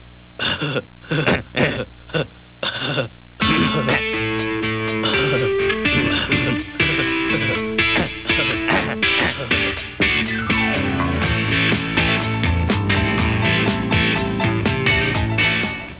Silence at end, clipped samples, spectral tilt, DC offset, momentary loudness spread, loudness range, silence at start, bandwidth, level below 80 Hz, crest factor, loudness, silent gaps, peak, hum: 0 s; under 0.1%; -9 dB/octave; 0.2%; 6 LU; 3 LU; 0.05 s; 4 kHz; -34 dBFS; 16 dB; -19 LUFS; none; -4 dBFS; none